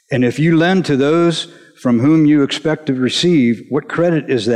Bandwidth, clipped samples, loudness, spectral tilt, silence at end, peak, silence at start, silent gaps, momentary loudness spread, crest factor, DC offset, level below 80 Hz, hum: 11 kHz; under 0.1%; -14 LUFS; -6 dB/octave; 0 s; -4 dBFS; 0.1 s; none; 8 LU; 10 dB; under 0.1%; -56 dBFS; none